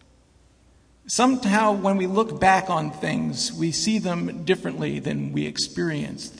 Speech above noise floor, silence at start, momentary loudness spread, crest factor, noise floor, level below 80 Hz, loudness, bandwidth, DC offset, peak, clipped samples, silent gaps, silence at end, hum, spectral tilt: 34 dB; 1.05 s; 8 LU; 20 dB; -57 dBFS; -54 dBFS; -23 LUFS; 10.5 kHz; under 0.1%; -4 dBFS; under 0.1%; none; 0 s; none; -4.5 dB/octave